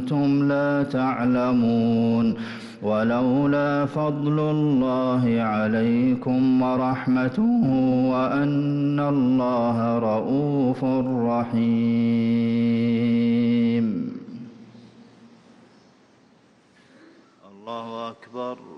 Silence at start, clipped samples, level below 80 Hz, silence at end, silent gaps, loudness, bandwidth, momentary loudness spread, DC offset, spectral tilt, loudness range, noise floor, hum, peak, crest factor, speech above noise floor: 0 s; under 0.1%; -58 dBFS; 0 s; none; -22 LUFS; 6 kHz; 12 LU; under 0.1%; -9 dB/octave; 6 LU; -57 dBFS; none; -14 dBFS; 8 dB; 36 dB